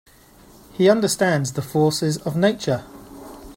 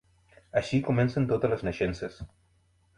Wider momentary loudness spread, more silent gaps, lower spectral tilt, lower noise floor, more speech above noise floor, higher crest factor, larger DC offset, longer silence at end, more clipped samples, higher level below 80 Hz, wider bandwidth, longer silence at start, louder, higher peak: first, 22 LU vs 13 LU; neither; second, -5 dB/octave vs -7.5 dB/octave; second, -49 dBFS vs -66 dBFS; second, 30 dB vs 39 dB; about the same, 20 dB vs 18 dB; neither; second, 0.05 s vs 0.7 s; neither; about the same, -52 dBFS vs -50 dBFS; first, 16.5 kHz vs 11 kHz; first, 0.75 s vs 0.55 s; first, -20 LUFS vs -29 LUFS; first, -2 dBFS vs -12 dBFS